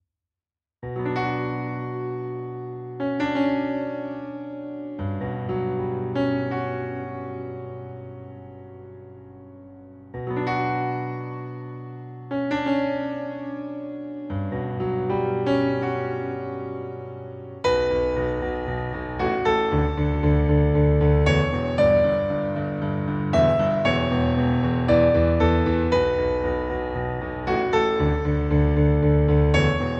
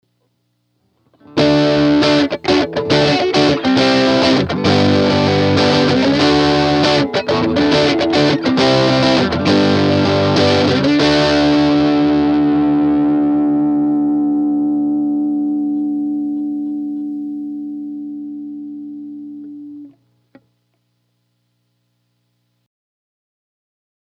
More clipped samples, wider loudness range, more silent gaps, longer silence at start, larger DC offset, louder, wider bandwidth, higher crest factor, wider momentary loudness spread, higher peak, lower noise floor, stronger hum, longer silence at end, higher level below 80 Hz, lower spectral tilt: neither; second, 10 LU vs 14 LU; neither; second, 0.8 s vs 1.35 s; neither; second, -23 LUFS vs -14 LUFS; second, 7.8 kHz vs 9 kHz; about the same, 18 dB vs 16 dB; about the same, 16 LU vs 14 LU; second, -6 dBFS vs 0 dBFS; first, under -90 dBFS vs -66 dBFS; second, none vs 60 Hz at -50 dBFS; second, 0 s vs 4.15 s; first, -34 dBFS vs -44 dBFS; first, -8 dB/octave vs -6 dB/octave